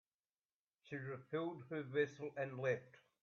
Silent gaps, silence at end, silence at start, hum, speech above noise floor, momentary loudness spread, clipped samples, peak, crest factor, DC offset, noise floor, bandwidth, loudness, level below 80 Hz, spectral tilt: none; 0.25 s; 0.85 s; none; over 47 dB; 8 LU; under 0.1%; -24 dBFS; 20 dB; under 0.1%; under -90 dBFS; 7 kHz; -44 LUFS; -86 dBFS; -5.5 dB/octave